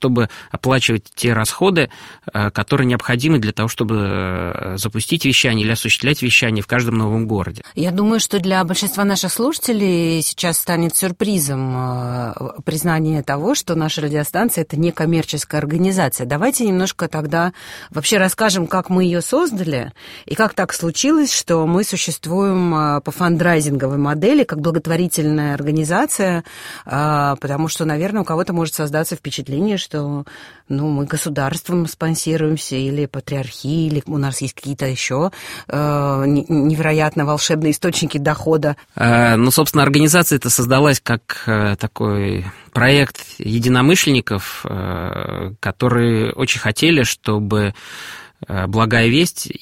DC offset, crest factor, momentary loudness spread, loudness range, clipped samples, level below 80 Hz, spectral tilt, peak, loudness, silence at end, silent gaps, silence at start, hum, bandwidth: under 0.1%; 18 dB; 10 LU; 5 LU; under 0.1%; -46 dBFS; -4.5 dB/octave; 0 dBFS; -17 LUFS; 0.05 s; none; 0 s; none; 16.5 kHz